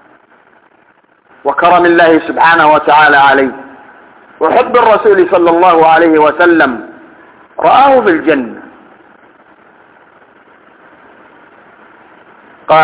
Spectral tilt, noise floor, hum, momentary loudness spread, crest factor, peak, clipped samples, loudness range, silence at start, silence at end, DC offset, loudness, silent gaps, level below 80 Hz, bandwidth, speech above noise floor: -8.5 dB/octave; -49 dBFS; none; 10 LU; 10 dB; 0 dBFS; 2%; 5 LU; 1.45 s; 0 s; under 0.1%; -8 LUFS; none; -52 dBFS; 4 kHz; 42 dB